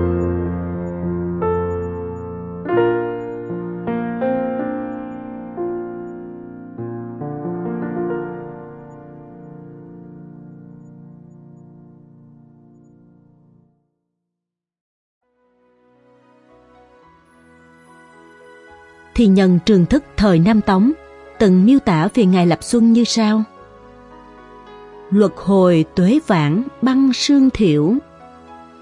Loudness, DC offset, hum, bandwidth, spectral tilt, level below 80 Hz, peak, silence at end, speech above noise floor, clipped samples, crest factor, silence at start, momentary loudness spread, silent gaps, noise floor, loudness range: -17 LUFS; under 0.1%; none; 11.5 kHz; -6.5 dB/octave; -44 dBFS; -2 dBFS; 0.2 s; 70 dB; under 0.1%; 18 dB; 0 s; 25 LU; 14.81-15.21 s; -83 dBFS; 14 LU